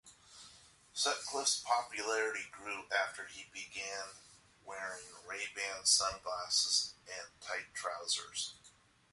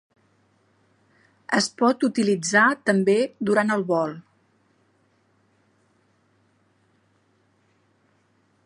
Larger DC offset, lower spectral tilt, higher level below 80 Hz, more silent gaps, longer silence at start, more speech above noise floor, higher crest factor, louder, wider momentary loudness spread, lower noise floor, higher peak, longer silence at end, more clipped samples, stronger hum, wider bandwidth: neither; second, 1.5 dB/octave vs -4.5 dB/octave; about the same, -72 dBFS vs -74 dBFS; neither; second, 0.05 s vs 1.5 s; second, 27 dB vs 44 dB; about the same, 22 dB vs 22 dB; second, -36 LUFS vs -21 LUFS; first, 17 LU vs 7 LU; about the same, -65 dBFS vs -65 dBFS; second, -16 dBFS vs -4 dBFS; second, 0.45 s vs 4.45 s; neither; neither; about the same, 12 kHz vs 11.5 kHz